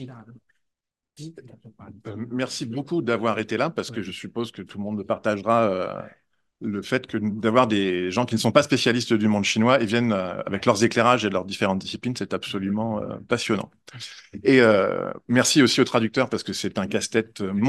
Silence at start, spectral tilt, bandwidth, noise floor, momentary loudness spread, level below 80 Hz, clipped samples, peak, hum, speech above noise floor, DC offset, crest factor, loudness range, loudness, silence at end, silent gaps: 0 s; -4.5 dB/octave; 12.5 kHz; -83 dBFS; 16 LU; -66 dBFS; under 0.1%; 0 dBFS; none; 60 dB; under 0.1%; 22 dB; 7 LU; -23 LUFS; 0 s; none